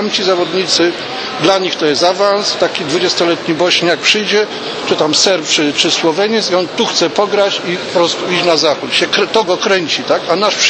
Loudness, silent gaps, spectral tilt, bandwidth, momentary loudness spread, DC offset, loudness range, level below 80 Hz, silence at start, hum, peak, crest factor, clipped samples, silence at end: -12 LUFS; none; -2.5 dB/octave; 8.8 kHz; 4 LU; under 0.1%; 1 LU; -60 dBFS; 0 s; none; 0 dBFS; 14 dB; under 0.1%; 0 s